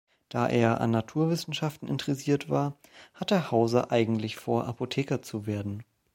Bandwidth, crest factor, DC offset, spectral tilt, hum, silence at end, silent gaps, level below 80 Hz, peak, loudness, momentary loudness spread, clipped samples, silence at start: 16.5 kHz; 20 dB; under 0.1%; -6.5 dB/octave; none; 0.3 s; none; -64 dBFS; -8 dBFS; -29 LUFS; 9 LU; under 0.1%; 0.3 s